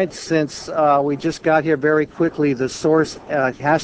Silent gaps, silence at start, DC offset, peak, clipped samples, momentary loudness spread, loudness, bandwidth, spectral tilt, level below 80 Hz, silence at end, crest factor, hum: none; 0 s; under 0.1%; -2 dBFS; under 0.1%; 4 LU; -19 LUFS; 8 kHz; -5.5 dB/octave; -54 dBFS; 0 s; 16 dB; none